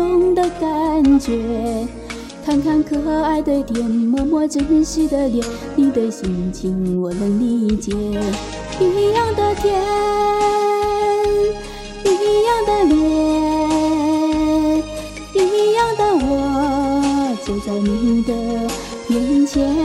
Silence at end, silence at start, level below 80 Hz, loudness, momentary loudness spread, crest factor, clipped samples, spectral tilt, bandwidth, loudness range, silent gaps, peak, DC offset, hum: 0 s; 0 s; -36 dBFS; -18 LUFS; 7 LU; 12 dB; under 0.1%; -5.5 dB/octave; 14.5 kHz; 3 LU; none; -4 dBFS; under 0.1%; none